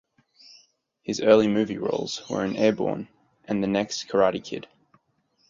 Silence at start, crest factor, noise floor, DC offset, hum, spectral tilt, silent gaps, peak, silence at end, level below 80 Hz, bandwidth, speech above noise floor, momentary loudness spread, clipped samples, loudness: 1.1 s; 22 dB; -69 dBFS; under 0.1%; none; -5 dB/octave; none; -4 dBFS; 0.85 s; -62 dBFS; 7.6 kHz; 45 dB; 17 LU; under 0.1%; -24 LUFS